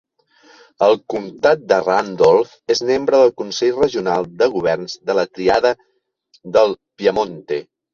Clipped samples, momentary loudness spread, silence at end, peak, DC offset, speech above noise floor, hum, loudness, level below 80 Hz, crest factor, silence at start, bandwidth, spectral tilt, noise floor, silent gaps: under 0.1%; 9 LU; 0.3 s; -2 dBFS; under 0.1%; 41 dB; none; -17 LUFS; -54 dBFS; 16 dB; 0.8 s; 7.4 kHz; -4.5 dB/octave; -58 dBFS; none